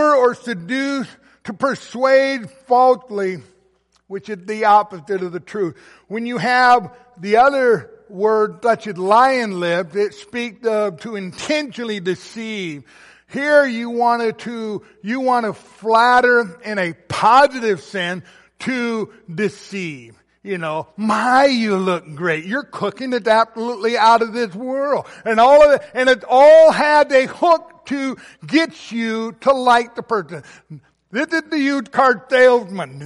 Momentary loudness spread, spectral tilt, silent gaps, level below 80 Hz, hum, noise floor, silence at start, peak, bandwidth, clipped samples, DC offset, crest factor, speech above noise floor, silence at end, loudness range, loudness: 15 LU; -5 dB/octave; none; -58 dBFS; none; -60 dBFS; 0 s; -2 dBFS; 11.5 kHz; under 0.1%; under 0.1%; 14 dB; 44 dB; 0 s; 8 LU; -17 LUFS